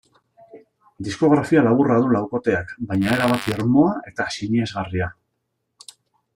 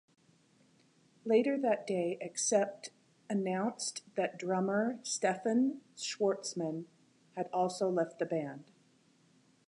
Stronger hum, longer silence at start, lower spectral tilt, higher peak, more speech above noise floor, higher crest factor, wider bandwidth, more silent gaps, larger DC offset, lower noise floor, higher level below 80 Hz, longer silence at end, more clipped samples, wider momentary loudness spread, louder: neither; second, 0.55 s vs 1.25 s; first, -6.5 dB/octave vs -4.5 dB/octave; first, -4 dBFS vs -16 dBFS; first, 56 dB vs 35 dB; about the same, 16 dB vs 18 dB; first, 16.5 kHz vs 11 kHz; neither; neither; first, -75 dBFS vs -68 dBFS; first, -54 dBFS vs -88 dBFS; first, 1.25 s vs 1.05 s; neither; second, 10 LU vs 13 LU; first, -20 LUFS vs -34 LUFS